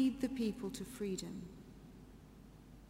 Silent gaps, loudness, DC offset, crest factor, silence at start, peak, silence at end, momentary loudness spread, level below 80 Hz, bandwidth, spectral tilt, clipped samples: none; -41 LUFS; under 0.1%; 18 dB; 0 s; -24 dBFS; 0 s; 20 LU; -62 dBFS; 16 kHz; -5.5 dB/octave; under 0.1%